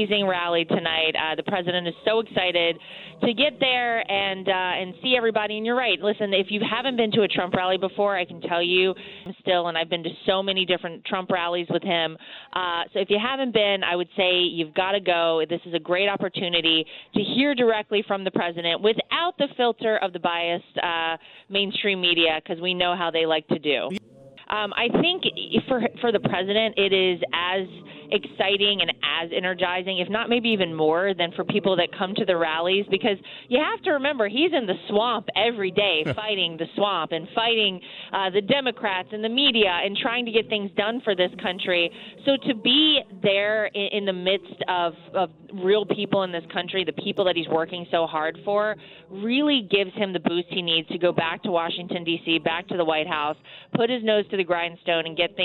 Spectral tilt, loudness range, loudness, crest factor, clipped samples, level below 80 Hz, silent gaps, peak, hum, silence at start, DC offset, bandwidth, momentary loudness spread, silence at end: -7 dB/octave; 2 LU; -23 LUFS; 18 dB; under 0.1%; -62 dBFS; none; -6 dBFS; none; 0 s; under 0.1%; 5.2 kHz; 7 LU; 0 s